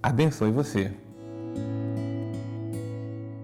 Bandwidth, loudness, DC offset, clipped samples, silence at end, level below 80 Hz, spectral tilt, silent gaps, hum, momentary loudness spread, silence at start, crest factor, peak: 15 kHz; -30 LUFS; under 0.1%; under 0.1%; 0 s; -56 dBFS; -7 dB/octave; none; none; 13 LU; 0 s; 16 dB; -14 dBFS